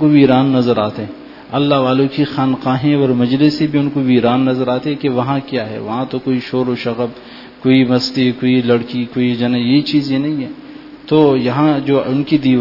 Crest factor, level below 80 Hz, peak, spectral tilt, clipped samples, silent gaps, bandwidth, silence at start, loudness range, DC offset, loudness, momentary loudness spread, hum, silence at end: 14 dB; -52 dBFS; 0 dBFS; -8 dB/octave; under 0.1%; none; 5.8 kHz; 0 s; 3 LU; under 0.1%; -15 LUFS; 10 LU; none; 0 s